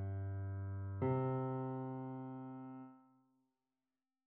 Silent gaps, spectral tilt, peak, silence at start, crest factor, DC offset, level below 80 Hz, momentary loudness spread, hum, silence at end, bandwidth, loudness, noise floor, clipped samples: none; -10.5 dB/octave; -26 dBFS; 0 s; 16 dB; under 0.1%; -76 dBFS; 14 LU; none; 1.25 s; 3.4 kHz; -43 LUFS; under -90 dBFS; under 0.1%